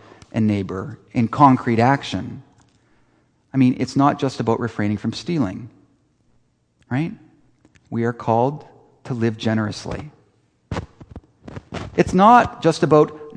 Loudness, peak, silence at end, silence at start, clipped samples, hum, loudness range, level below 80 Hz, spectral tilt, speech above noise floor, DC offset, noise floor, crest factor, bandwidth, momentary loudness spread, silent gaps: -19 LUFS; 0 dBFS; 0 s; 0.35 s; under 0.1%; none; 8 LU; -48 dBFS; -7 dB/octave; 44 dB; under 0.1%; -62 dBFS; 20 dB; 10 kHz; 18 LU; none